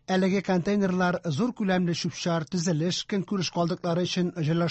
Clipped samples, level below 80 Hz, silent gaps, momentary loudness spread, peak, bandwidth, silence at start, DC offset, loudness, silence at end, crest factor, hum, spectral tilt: under 0.1%; -62 dBFS; none; 4 LU; -12 dBFS; 8.4 kHz; 0.1 s; under 0.1%; -27 LUFS; 0 s; 14 dB; none; -5.5 dB/octave